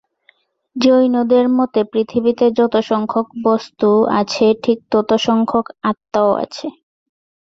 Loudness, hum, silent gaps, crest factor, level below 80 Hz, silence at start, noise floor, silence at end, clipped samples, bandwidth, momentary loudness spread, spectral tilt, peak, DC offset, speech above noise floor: -16 LUFS; none; none; 14 dB; -58 dBFS; 0.75 s; -57 dBFS; 0.8 s; under 0.1%; 7.8 kHz; 7 LU; -6 dB/octave; -2 dBFS; under 0.1%; 42 dB